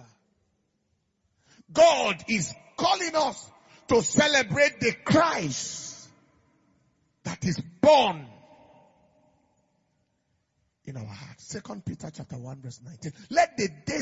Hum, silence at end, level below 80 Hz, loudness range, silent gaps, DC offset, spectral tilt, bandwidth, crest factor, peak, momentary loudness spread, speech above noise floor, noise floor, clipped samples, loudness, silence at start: none; 0 s; -62 dBFS; 17 LU; none; under 0.1%; -3.5 dB/octave; 8 kHz; 22 dB; -6 dBFS; 21 LU; 48 dB; -74 dBFS; under 0.1%; -24 LUFS; 1.7 s